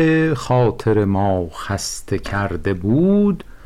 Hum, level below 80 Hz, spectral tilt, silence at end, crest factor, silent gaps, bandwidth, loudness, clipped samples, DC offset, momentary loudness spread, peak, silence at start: none; -38 dBFS; -6.5 dB/octave; 0 s; 10 dB; none; 14 kHz; -19 LUFS; under 0.1%; under 0.1%; 8 LU; -8 dBFS; 0 s